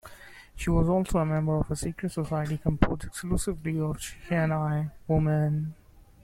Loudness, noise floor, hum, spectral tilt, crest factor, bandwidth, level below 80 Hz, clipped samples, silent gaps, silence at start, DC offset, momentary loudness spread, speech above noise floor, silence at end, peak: -28 LUFS; -48 dBFS; none; -7 dB/octave; 26 dB; 14 kHz; -40 dBFS; under 0.1%; none; 0.05 s; under 0.1%; 9 LU; 21 dB; 0.25 s; -2 dBFS